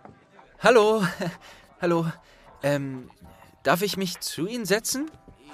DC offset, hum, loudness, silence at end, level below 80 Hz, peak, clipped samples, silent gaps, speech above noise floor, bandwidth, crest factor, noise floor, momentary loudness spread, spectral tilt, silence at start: under 0.1%; none; -25 LUFS; 0 s; -60 dBFS; -4 dBFS; under 0.1%; none; 29 dB; 15.5 kHz; 22 dB; -53 dBFS; 16 LU; -4.5 dB/octave; 0.6 s